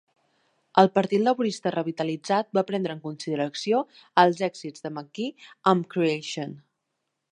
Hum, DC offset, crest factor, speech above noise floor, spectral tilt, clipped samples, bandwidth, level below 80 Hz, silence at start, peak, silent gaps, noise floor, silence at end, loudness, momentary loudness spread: none; under 0.1%; 24 dB; 55 dB; -5.5 dB/octave; under 0.1%; 11 kHz; -76 dBFS; 0.75 s; -2 dBFS; none; -80 dBFS; 0.75 s; -25 LUFS; 14 LU